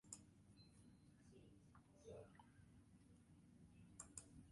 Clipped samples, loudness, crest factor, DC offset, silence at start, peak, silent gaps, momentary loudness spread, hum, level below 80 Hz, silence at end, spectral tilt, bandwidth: under 0.1%; -64 LUFS; 28 dB; under 0.1%; 0.05 s; -38 dBFS; none; 11 LU; none; -78 dBFS; 0 s; -4.5 dB/octave; 11.5 kHz